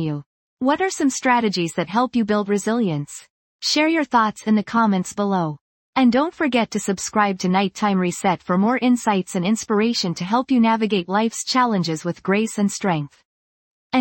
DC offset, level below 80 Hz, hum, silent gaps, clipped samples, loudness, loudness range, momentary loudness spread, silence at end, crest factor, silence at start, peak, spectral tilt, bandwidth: under 0.1%; -62 dBFS; none; 0.26-0.57 s, 3.30-3.59 s, 5.61-5.93 s, 13.25-13.90 s; under 0.1%; -20 LUFS; 1 LU; 7 LU; 0 s; 16 dB; 0 s; -4 dBFS; -5 dB/octave; 17 kHz